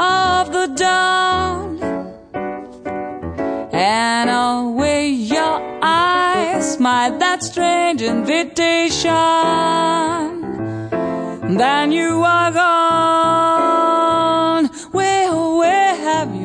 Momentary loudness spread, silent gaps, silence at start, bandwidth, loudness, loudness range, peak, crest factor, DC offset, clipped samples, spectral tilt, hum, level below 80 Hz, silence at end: 10 LU; none; 0 s; 10 kHz; -16 LUFS; 5 LU; -4 dBFS; 12 dB; under 0.1%; under 0.1%; -3.5 dB/octave; none; -48 dBFS; 0 s